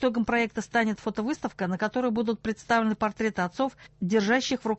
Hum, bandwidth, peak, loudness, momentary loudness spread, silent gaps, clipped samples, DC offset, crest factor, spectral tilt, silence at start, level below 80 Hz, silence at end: none; 8.4 kHz; -10 dBFS; -27 LUFS; 7 LU; none; under 0.1%; under 0.1%; 18 dB; -5 dB/octave; 0 s; -58 dBFS; 0 s